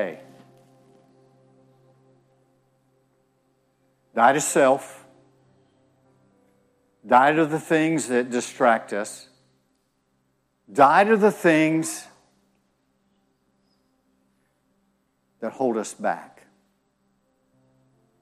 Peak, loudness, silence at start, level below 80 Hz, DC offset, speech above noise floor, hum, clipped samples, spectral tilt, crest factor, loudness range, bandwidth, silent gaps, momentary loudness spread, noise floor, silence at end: -4 dBFS; -21 LUFS; 0 s; -74 dBFS; under 0.1%; 49 dB; none; under 0.1%; -4.5 dB/octave; 22 dB; 10 LU; 15 kHz; none; 18 LU; -70 dBFS; 1.95 s